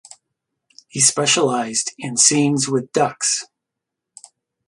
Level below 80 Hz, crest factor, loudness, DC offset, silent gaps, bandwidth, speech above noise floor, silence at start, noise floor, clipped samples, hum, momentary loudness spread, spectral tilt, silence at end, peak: -66 dBFS; 20 dB; -17 LUFS; under 0.1%; none; 11.5 kHz; 64 dB; 0.95 s; -82 dBFS; under 0.1%; none; 9 LU; -2.5 dB/octave; 1.25 s; 0 dBFS